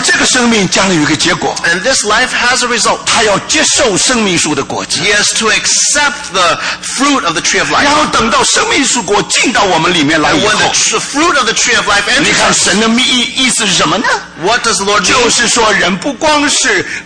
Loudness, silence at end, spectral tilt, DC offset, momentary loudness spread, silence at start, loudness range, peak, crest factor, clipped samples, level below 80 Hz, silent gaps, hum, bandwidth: -9 LUFS; 0 s; -1.5 dB/octave; under 0.1%; 4 LU; 0 s; 1 LU; 0 dBFS; 10 dB; under 0.1%; -38 dBFS; none; none; 10.5 kHz